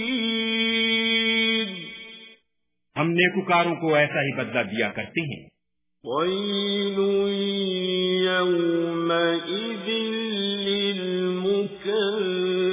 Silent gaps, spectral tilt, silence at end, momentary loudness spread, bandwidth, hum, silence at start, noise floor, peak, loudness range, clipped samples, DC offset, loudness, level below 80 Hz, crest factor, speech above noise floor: none; -9 dB/octave; 0 s; 9 LU; 3.9 kHz; none; 0 s; -80 dBFS; -4 dBFS; 3 LU; under 0.1%; under 0.1%; -23 LUFS; -68 dBFS; 20 dB; 57 dB